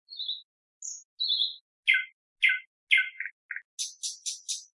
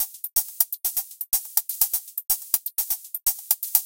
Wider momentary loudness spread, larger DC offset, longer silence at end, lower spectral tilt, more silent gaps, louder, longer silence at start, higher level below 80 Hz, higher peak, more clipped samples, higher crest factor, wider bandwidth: first, 15 LU vs 4 LU; neither; about the same, 0.1 s vs 0 s; second, 11 dB/octave vs 3 dB/octave; first, 0.44-0.81 s, 1.05-1.18 s, 1.61-1.83 s, 2.13-2.36 s, 2.67-2.87 s, 3.32-3.49 s, 3.65-3.77 s vs none; second, -28 LUFS vs -23 LUFS; about the same, 0.1 s vs 0 s; second, -88 dBFS vs -62 dBFS; second, -8 dBFS vs 0 dBFS; neither; about the same, 24 dB vs 26 dB; second, 11.5 kHz vs 17.5 kHz